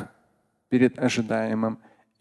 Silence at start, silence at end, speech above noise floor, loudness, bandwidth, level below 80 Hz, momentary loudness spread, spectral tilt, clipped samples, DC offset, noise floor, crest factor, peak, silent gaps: 0 s; 0.45 s; 45 dB; -25 LUFS; 11.5 kHz; -64 dBFS; 14 LU; -6 dB/octave; under 0.1%; under 0.1%; -68 dBFS; 20 dB; -8 dBFS; none